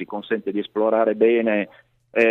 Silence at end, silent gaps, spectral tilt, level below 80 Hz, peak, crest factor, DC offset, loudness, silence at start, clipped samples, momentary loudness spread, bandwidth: 0 s; none; -7.5 dB/octave; -70 dBFS; -4 dBFS; 16 dB; under 0.1%; -21 LUFS; 0 s; under 0.1%; 9 LU; 6 kHz